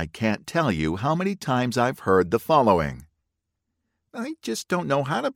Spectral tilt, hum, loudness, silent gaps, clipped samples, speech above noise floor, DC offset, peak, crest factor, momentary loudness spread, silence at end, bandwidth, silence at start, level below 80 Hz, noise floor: -6 dB/octave; none; -23 LUFS; none; under 0.1%; 57 dB; under 0.1%; -4 dBFS; 20 dB; 12 LU; 0.05 s; 17 kHz; 0 s; -50 dBFS; -80 dBFS